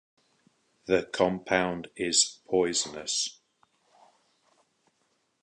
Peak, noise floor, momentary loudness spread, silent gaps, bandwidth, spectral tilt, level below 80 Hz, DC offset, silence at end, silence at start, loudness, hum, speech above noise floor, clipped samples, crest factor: -8 dBFS; -73 dBFS; 9 LU; none; 11 kHz; -2 dB/octave; -64 dBFS; under 0.1%; 2.1 s; 0.85 s; -27 LUFS; none; 46 dB; under 0.1%; 24 dB